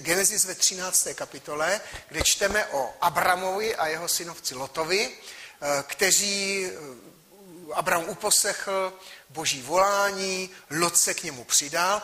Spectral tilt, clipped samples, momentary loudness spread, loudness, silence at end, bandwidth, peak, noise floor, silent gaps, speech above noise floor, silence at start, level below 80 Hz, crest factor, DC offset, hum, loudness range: -1 dB/octave; under 0.1%; 12 LU; -24 LUFS; 0 s; 15.5 kHz; -6 dBFS; -48 dBFS; none; 22 dB; 0 s; -54 dBFS; 20 dB; under 0.1%; none; 3 LU